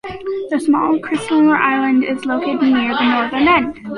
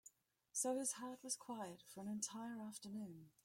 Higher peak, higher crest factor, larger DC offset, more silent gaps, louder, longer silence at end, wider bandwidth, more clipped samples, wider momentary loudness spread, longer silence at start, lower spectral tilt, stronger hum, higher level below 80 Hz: first, -2 dBFS vs -28 dBFS; second, 14 dB vs 20 dB; neither; neither; first, -16 LUFS vs -47 LUFS; second, 0 s vs 0.15 s; second, 11.5 kHz vs 16.5 kHz; neither; second, 6 LU vs 11 LU; about the same, 0.05 s vs 0.05 s; first, -5 dB/octave vs -3 dB/octave; neither; first, -50 dBFS vs -90 dBFS